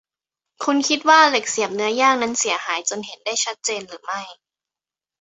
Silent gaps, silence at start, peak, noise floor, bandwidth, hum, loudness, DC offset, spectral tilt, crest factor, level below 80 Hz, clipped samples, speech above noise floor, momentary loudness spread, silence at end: none; 0.6 s; -2 dBFS; -90 dBFS; 8.2 kHz; none; -19 LUFS; under 0.1%; -1 dB/octave; 20 dB; -70 dBFS; under 0.1%; 70 dB; 16 LU; 0.9 s